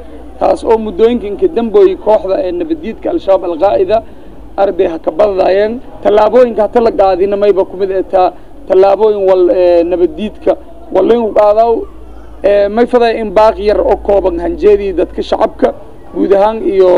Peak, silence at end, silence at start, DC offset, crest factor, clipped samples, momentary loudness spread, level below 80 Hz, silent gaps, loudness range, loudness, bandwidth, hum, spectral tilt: 0 dBFS; 0 s; 0 s; 3%; 10 dB; 0.5%; 8 LU; -34 dBFS; none; 2 LU; -11 LUFS; 10.5 kHz; none; -7 dB/octave